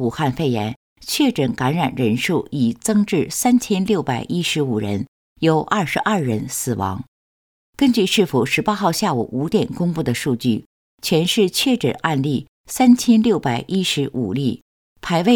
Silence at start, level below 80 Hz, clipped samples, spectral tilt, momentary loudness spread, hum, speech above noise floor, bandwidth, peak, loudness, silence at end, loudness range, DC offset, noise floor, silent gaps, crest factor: 0 s; -52 dBFS; under 0.1%; -5 dB/octave; 8 LU; none; over 72 dB; 19.5 kHz; -2 dBFS; -19 LUFS; 0 s; 3 LU; under 0.1%; under -90 dBFS; 0.76-0.96 s, 5.08-5.36 s, 7.08-7.73 s, 10.66-10.98 s, 12.48-12.64 s, 14.62-14.96 s; 16 dB